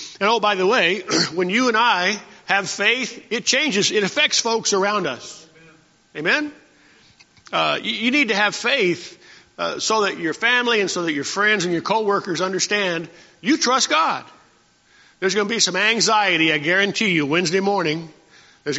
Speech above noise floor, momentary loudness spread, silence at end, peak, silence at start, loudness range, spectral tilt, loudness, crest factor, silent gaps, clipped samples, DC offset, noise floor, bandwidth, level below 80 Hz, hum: 37 dB; 10 LU; 0 s; -2 dBFS; 0 s; 3 LU; -1.5 dB/octave; -19 LUFS; 20 dB; none; under 0.1%; under 0.1%; -57 dBFS; 8 kHz; -68 dBFS; none